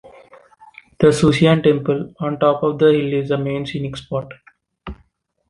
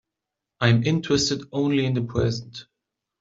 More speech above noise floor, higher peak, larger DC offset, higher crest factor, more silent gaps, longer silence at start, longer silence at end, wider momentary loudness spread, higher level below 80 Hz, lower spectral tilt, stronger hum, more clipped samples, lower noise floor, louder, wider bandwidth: second, 43 dB vs 63 dB; about the same, -2 dBFS vs -4 dBFS; neither; about the same, 16 dB vs 20 dB; neither; first, 1 s vs 0.6 s; about the same, 0.55 s vs 0.6 s; first, 23 LU vs 11 LU; about the same, -46 dBFS vs -50 dBFS; about the same, -6.5 dB/octave vs -5.5 dB/octave; neither; neither; second, -59 dBFS vs -85 dBFS; first, -17 LUFS vs -23 LUFS; first, 11.5 kHz vs 7.8 kHz